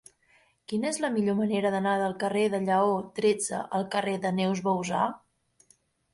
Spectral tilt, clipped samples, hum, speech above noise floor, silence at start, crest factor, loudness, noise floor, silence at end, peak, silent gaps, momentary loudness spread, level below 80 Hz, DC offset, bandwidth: -5 dB/octave; under 0.1%; none; 39 dB; 0.7 s; 16 dB; -28 LUFS; -66 dBFS; 0.95 s; -14 dBFS; none; 5 LU; -70 dBFS; under 0.1%; 11.5 kHz